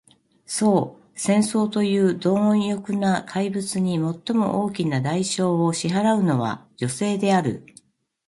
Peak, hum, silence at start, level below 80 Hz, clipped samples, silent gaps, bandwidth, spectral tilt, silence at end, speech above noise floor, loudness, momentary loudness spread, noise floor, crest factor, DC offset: -6 dBFS; none; 0.5 s; -62 dBFS; under 0.1%; none; 11.5 kHz; -5.5 dB/octave; 0.65 s; 34 dB; -22 LUFS; 8 LU; -55 dBFS; 16 dB; under 0.1%